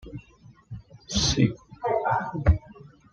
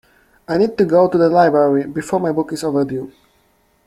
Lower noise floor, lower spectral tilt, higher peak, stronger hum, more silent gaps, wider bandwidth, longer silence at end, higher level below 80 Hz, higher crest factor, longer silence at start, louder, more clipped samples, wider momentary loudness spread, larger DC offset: second, -54 dBFS vs -58 dBFS; second, -5 dB/octave vs -7 dB/octave; second, -6 dBFS vs -2 dBFS; neither; neither; second, 10 kHz vs 14 kHz; second, 0.25 s vs 0.75 s; first, -36 dBFS vs -56 dBFS; first, 20 dB vs 14 dB; second, 0.05 s vs 0.5 s; second, -25 LUFS vs -16 LUFS; neither; first, 21 LU vs 10 LU; neither